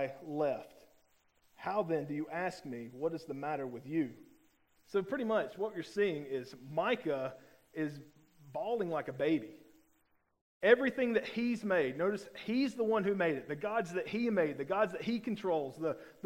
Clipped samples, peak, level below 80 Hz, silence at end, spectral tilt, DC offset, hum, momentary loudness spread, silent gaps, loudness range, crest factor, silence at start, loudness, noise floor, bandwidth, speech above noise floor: under 0.1%; -12 dBFS; -74 dBFS; 0.15 s; -6.5 dB/octave; under 0.1%; none; 9 LU; 10.41-10.61 s; 6 LU; 24 dB; 0 s; -35 LUFS; -74 dBFS; 16 kHz; 40 dB